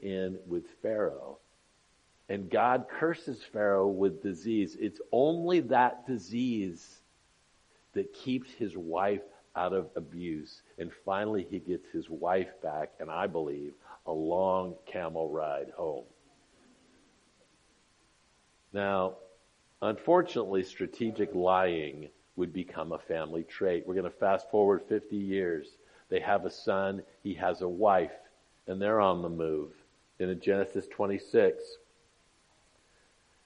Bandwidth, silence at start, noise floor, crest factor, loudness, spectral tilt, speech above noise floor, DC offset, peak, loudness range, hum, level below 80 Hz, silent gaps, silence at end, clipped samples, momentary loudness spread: 10 kHz; 0 s; -68 dBFS; 22 dB; -32 LUFS; -7 dB/octave; 37 dB; under 0.1%; -10 dBFS; 6 LU; none; -72 dBFS; none; 1.7 s; under 0.1%; 13 LU